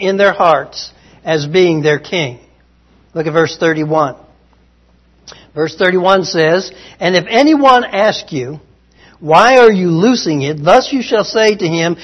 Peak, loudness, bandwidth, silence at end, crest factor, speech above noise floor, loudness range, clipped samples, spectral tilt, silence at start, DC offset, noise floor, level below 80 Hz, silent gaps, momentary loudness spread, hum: 0 dBFS; -12 LUFS; 10.5 kHz; 0 s; 12 dB; 38 dB; 7 LU; 0.4%; -5 dB/octave; 0 s; under 0.1%; -50 dBFS; -50 dBFS; none; 14 LU; none